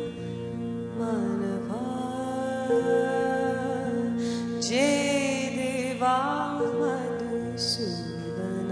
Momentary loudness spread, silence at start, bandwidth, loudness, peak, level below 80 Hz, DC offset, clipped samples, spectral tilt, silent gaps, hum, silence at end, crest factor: 9 LU; 0 s; 11 kHz; -28 LUFS; -12 dBFS; -62 dBFS; under 0.1%; under 0.1%; -4.5 dB/octave; none; none; 0 s; 16 dB